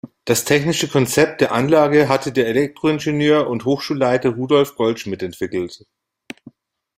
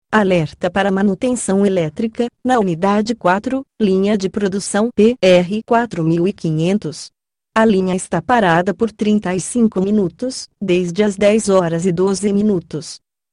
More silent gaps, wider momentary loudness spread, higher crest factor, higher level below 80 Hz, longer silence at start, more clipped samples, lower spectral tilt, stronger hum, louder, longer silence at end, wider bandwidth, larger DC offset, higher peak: neither; first, 11 LU vs 8 LU; about the same, 16 dB vs 14 dB; second, -56 dBFS vs -50 dBFS; about the same, 0.05 s vs 0.1 s; neither; about the same, -5 dB/octave vs -5.5 dB/octave; neither; about the same, -18 LUFS vs -16 LUFS; first, 1.2 s vs 0.35 s; first, 16 kHz vs 11.5 kHz; neither; about the same, -2 dBFS vs -2 dBFS